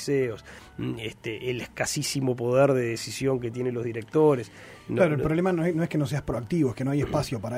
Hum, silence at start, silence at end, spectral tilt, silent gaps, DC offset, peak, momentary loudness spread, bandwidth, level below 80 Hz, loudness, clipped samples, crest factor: none; 0 s; 0 s; -6 dB/octave; none; under 0.1%; -8 dBFS; 12 LU; 16 kHz; -52 dBFS; -26 LUFS; under 0.1%; 18 dB